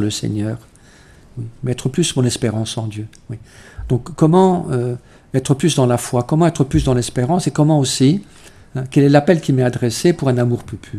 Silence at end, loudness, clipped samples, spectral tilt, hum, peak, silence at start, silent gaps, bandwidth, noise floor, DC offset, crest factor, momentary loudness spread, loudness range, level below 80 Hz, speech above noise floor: 0 s; -17 LUFS; under 0.1%; -6 dB/octave; none; 0 dBFS; 0 s; none; 14 kHz; -45 dBFS; under 0.1%; 16 dB; 18 LU; 6 LU; -40 dBFS; 29 dB